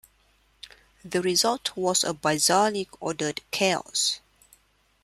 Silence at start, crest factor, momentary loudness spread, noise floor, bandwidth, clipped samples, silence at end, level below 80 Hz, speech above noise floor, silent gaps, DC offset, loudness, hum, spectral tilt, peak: 0.65 s; 20 dB; 10 LU; -64 dBFS; 15.5 kHz; under 0.1%; 0.85 s; -64 dBFS; 39 dB; none; under 0.1%; -25 LUFS; none; -2 dB/octave; -8 dBFS